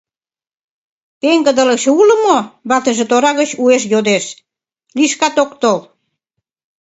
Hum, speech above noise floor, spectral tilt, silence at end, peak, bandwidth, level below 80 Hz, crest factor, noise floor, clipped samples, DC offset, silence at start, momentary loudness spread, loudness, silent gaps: none; over 78 dB; -3 dB/octave; 1 s; 0 dBFS; 8.2 kHz; -62 dBFS; 14 dB; under -90 dBFS; under 0.1%; under 0.1%; 1.25 s; 7 LU; -13 LUFS; none